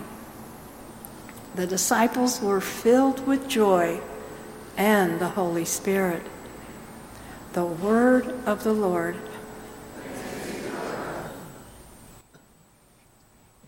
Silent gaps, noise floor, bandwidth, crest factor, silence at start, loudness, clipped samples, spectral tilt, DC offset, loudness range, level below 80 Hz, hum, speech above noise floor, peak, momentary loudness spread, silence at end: none; -58 dBFS; 17 kHz; 20 dB; 0 s; -24 LUFS; under 0.1%; -4.5 dB/octave; under 0.1%; 13 LU; -56 dBFS; none; 35 dB; -6 dBFS; 21 LU; 1.5 s